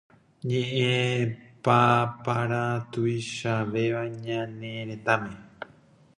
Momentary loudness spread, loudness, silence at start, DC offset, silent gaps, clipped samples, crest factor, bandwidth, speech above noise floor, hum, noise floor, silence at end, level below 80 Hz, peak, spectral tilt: 14 LU; -27 LUFS; 0.45 s; under 0.1%; none; under 0.1%; 22 dB; 11 kHz; 30 dB; none; -57 dBFS; 0.55 s; -64 dBFS; -6 dBFS; -6 dB/octave